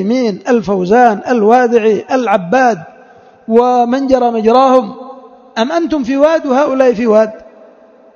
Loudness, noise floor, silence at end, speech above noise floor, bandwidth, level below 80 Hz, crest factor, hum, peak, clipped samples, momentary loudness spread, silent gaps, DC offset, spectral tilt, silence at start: -11 LUFS; -42 dBFS; 0.75 s; 31 dB; 7.2 kHz; -50 dBFS; 12 dB; none; 0 dBFS; 0.3%; 6 LU; none; under 0.1%; -6 dB/octave; 0 s